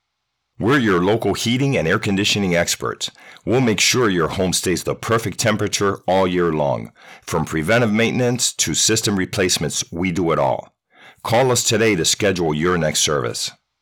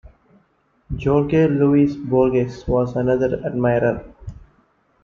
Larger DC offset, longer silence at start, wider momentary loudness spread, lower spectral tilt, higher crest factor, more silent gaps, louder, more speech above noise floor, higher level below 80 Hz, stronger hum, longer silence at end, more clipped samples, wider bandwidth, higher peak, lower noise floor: neither; second, 0.6 s vs 0.9 s; second, 8 LU vs 15 LU; second, -3.5 dB/octave vs -9.5 dB/octave; about the same, 14 dB vs 16 dB; neither; about the same, -18 LUFS vs -19 LUFS; first, 57 dB vs 44 dB; second, -48 dBFS vs -40 dBFS; neither; second, 0.3 s vs 0.65 s; neither; first, over 20 kHz vs 7 kHz; about the same, -6 dBFS vs -4 dBFS; first, -75 dBFS vs -62 dBFS